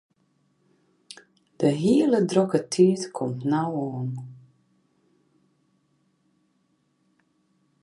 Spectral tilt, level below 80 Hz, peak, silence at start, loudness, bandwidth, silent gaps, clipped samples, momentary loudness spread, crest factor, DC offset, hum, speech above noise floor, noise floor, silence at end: -6.5 dB/octave; -70 dBFS; -6 dBFS; 1.6 s; -23 LUFS; 11.5 kHz; none; under 0.1%; 25 LU; 20 dB; under 0.1%; none; 47 dB; -69 dBFS; 3.45 s